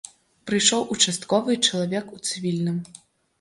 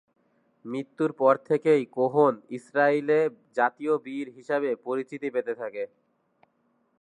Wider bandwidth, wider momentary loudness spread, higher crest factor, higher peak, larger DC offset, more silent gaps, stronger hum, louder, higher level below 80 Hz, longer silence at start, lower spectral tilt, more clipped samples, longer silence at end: first, 11.5 kHz vs 9.8 kHz; about the same, 15 LU vs 14 LU; about the same, 20 dB vs 20 dB; first, -4 dBFS vs -8 dBFS; neither; neither; neither; first, -22 LUFS vs -26 LUFS; first, -66 dBFS vs -84 dBFS; second, 0.45 s vs 0.65 s; second, -3 dB/octave vs -7 dB/octave; neither; second, 0.55 s vs 1.15 s